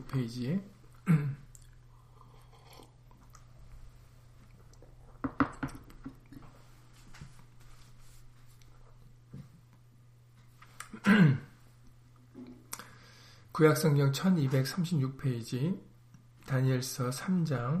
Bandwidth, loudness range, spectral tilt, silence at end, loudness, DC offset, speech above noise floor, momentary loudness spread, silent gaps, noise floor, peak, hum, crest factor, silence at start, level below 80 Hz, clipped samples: 15.5 kHz; 12 LU; -6.5 dB/octave; 0 s; -30 LUFS; under 0.1%; 29 dB; 27 LU; none; -59 dBFS; -12 dBFS; none; 22 dB; 0 s; -58 dBFS; under 0.1%